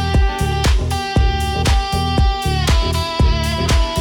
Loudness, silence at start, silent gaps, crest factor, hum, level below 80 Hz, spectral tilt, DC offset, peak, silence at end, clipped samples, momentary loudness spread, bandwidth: -17 LUFS; 0 s; none; 10 dB; none; -18 dBFS; -5 dB/octave; under 0.1%; -6 dBFS; 0 s; under 0.1%; 2 LU; 18 kHz